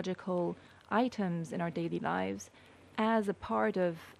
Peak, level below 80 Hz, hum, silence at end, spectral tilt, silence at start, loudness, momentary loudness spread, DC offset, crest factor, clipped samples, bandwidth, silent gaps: -18 dBFS; -68 dBFS; none; 0.1 s; -6.5 dB/octave; 0 s; -34 LUFS; 10 LU; under 0.1%; 16 dB; under 0.1%; 13 kHz; none